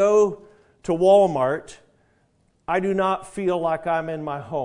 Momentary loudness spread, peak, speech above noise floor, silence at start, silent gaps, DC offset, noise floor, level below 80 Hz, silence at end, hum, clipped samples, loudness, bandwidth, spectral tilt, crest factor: 14 LU; -6 dBFS; 43 dB; 0 s; none; under 0.1%; -64 dBFS; -56 dBFS; 0 s; none; under 0.1%; -22 LUFS; 11 kHz; -6 dB/octave; 16 dB